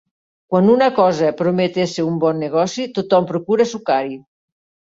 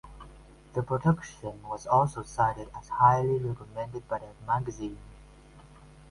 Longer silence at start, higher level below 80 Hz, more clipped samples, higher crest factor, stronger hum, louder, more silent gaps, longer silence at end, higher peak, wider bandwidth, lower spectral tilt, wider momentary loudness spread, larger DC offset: first, 0.5 s vs 0.05 s; second, -60 dBFS vs -52 dBFS; neither; second, 16 dB vs 22 dB; neither; first, -17 LUFS vs -29 LUFS; neither; first, 0.75 s vs 0.5 s; first, -2 dBFS vs -8 dBFS; second, 7.8 kHz vs 11.5 kHz; second, -6 dB/octave vs -7.5 dB/octave; second, 7 LU vs 17 LU; neither